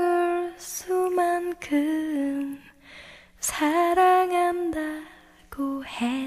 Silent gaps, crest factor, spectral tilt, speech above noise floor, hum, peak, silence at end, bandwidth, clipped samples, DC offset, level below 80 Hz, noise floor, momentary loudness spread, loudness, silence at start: none; 14 dB; -3 dB/octave; 24 dB; none; -12 dBFS; 0 s; 15.5 kHz; under 0.1%; under 0.1%; -58 dBFS; -48 dBFS; 18 LU; -25 LUFS; 0 s